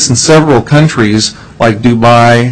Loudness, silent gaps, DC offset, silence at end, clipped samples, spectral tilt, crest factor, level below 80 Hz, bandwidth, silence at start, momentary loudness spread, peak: -7 LUFS; none; under 0.1%; 0 s; 1%; -5 dB/octave; 6 dB; -36 dBFS; 11 kHz; 0 s; 6 LU; 0 dBFS